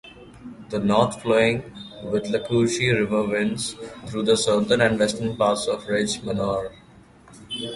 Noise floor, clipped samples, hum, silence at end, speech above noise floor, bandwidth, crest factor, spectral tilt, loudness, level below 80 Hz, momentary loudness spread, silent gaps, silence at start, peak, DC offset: -50 dBFS; under 0.1%; none; 0 s; 28 dB; 11.5 kHz; 20 dB; -4.5 dB/octave; -22 LUFS; -52 dBFS; 15 LU; none; 0.05 s; -4 dBFS; under 0.1%